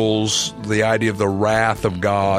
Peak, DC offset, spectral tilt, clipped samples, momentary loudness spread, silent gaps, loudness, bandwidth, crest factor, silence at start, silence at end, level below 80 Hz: -2 dBFS; under 0.1%; -4 dB/octave; under 0.1%; 3 LU; none; -19 LUFS; 14.5 kHz; 16 dB; 0 s; 0 s; -46 dBFS